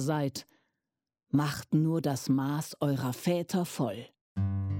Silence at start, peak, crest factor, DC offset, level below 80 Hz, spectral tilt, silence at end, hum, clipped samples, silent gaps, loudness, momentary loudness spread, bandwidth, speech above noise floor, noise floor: 0 s; -16 dBFS; 16 dB; under 0.1%; -66 dBFS; -6.5 dB/octave; 0 s; none; under 0.1%; 4.21-4.35 s; -31 LUFS; 6 LU; 17 kHz; 58 dB; -88 dBFS